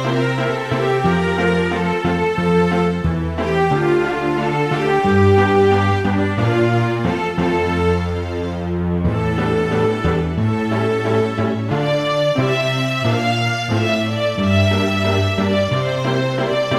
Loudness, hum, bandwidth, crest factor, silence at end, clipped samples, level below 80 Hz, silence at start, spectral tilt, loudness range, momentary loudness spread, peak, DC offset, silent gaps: -18 LUFS; none; 13.5 kHz; 14 dB; 0 s; under 0.1%; -38 dBFS; 0 s; -6.5 dB/octave; 3 LU; 4 LU; -2 dBFS; 0.2%; none